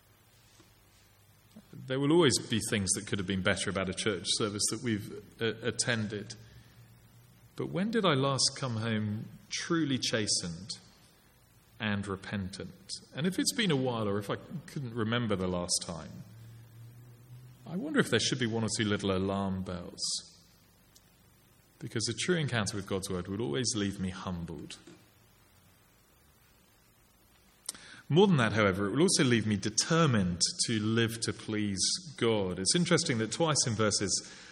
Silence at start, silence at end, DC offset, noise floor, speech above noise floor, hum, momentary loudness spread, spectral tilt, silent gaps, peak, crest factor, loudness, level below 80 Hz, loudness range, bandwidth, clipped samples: 1.55 s; 0 s; under 0.1%; -64 dBFS; 33 dB; none; 15 LU; -4 dB/octave; none; -10 dBFS; 22 dB; -31 LUFS; -64 dBFS; 8 LU; 16.5 kHz; under 0.1%